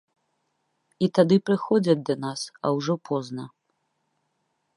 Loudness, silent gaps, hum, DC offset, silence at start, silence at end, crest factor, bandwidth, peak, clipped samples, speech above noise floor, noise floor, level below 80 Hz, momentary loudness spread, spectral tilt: -24 LUFS; none; none; under 0.1%; 1 s; 1.3 s; 22 dB; 11.5 kHz; -4 dBFS; under 0.1%; 51 dB; -75 dBFS; -72 dBFS; 13 LU; -6.5 dB/octave